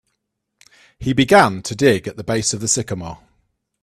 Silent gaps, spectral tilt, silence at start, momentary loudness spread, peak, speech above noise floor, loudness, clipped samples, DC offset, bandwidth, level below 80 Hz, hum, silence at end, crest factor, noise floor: none; -4 dB/octave; 1 s; 15 LU; 0 dBFS; 58 dB; -17 LUFS; under 0.1%; under 0.1%; 14 kHz; -48 dBFS; none; 0.65 s; 20 dB; -75 dBFS